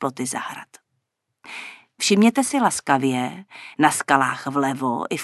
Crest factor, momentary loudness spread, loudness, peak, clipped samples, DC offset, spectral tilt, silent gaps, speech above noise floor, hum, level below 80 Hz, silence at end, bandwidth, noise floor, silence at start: 22 dB; 19 LU; -21 LUFS; -2 dBFS; under 0.1%; under 0.1%; -4 dB/octave; none; 55 dB; none; -68 dBFS; 0 s; 12.5 kHz; -76 dBFS; 0 s